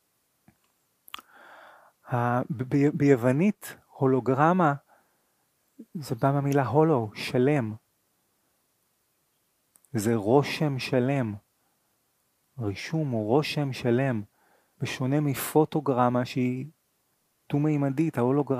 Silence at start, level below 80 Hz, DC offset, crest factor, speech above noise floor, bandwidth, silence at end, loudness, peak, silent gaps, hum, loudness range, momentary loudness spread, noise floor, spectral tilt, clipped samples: 1.15 s; -68 dBFS; under 0.1%; 20 dB; 47 dB; 15.5 kHz; 0 s; -26 LUFS; -6 dBFS; none; none; 4 LU; 14 LU; -72 dBFS; -7 dB/octave; under 0.1%